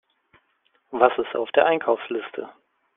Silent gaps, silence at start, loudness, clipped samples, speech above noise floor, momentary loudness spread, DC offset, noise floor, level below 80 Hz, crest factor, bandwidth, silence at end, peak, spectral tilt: none; 0.9 s; -22 LUFS; under 0.1%; 45 dB; 15 LU; under 0.1%; -67 dBFS; -68 dBFS; 22 dB; 3.9 kHz; 0.45 s; -2 dBFS; -1.5 dB/octave